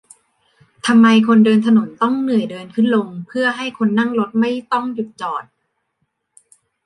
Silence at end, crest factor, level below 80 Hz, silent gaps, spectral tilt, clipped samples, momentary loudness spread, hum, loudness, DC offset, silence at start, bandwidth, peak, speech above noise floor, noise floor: 1.45 s; 14 dB; -68 dBFS; none; -6 dB/octave; under 0.1%; 14 LU; none; -16 LUFS; under 0.1%; 0.85 s; 11 kHz; -2 dBFS; 55 dB; -71 dBFS